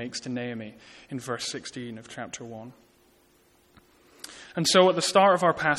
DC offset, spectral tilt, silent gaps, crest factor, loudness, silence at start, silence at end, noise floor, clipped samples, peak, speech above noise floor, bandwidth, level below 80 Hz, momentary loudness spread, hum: under 0.1%; -3.5 dB/octave; none; 20 dB; -24 LUFS; 0 s; 0 s; -62 dBFS; under 0.1%; -6 dBFS; 36 dB; 14.5 kHz; -66 dBFS; 23 LU; none